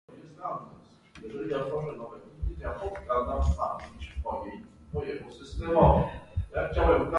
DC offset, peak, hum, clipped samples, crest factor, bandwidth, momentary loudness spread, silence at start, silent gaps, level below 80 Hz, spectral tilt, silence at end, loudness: under 0.1%; -6 dBFS; none; under 0.1%; 24 dB; 10.5 kHz; 19 LU; 0.1 s; none; -36 dBFS; -8 dB/octave; 0 s; -30 LUFS